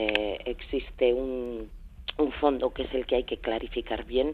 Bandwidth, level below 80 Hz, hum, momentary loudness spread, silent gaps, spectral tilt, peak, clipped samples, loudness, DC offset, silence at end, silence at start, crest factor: 4.9 kHz; -44 dBFS; none; 11 LU; none; -6.5 dB/octave; -6 dBFS; under 0.1%; -29 LUFS; under 0.1%; 0 s; 0 s; 22 dB